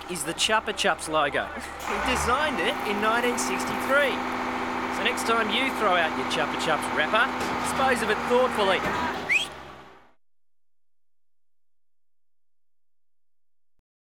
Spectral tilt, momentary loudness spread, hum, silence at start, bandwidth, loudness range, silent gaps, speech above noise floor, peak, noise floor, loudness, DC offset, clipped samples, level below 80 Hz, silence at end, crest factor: -2.5 dB/octave; 6 LU; none; 0 s; 18 kHz; 5 LU; none; over 65 dB; -8 dBFS; under -90 dBFS; -25 LUFS; 0.1%; under 0.1%; -52 dBFS; 4.15 s; 20 dB